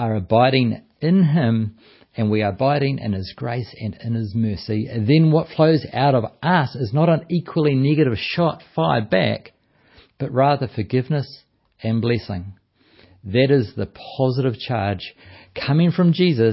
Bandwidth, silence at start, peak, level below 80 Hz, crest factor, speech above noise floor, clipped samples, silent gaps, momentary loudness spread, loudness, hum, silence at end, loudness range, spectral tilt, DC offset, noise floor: 5.8 kHz; 0 s; -2 dBFS; -48 dBFS; 16 dB; 35 dB; under 0.1%; none; 13 LU; -20 LUFS; none; 0 s; 5 LU; -12 dB/octave; under 0.1%; -54 dBFS